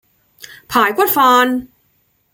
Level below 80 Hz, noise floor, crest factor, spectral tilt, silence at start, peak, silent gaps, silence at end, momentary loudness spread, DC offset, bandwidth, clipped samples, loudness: -56 dBFS; -61 dBFS; 16 dB; -2.5 dB/octave; 0.5 s; -2 dBFS; none; 0.7 s; 8 LU; under 0.1%; 17 kHz; under 0.1%; -13 LUFS